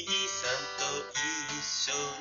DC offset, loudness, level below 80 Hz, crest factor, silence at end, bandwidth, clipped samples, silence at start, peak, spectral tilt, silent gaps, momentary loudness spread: under 0.1%; -31 LUFS; -66 dBFS; 16 dB; 0 s; 7.6 kHz; under 0.1%; 0 s; -18 dBFS; 0.5 dB/octave; none; 3 LU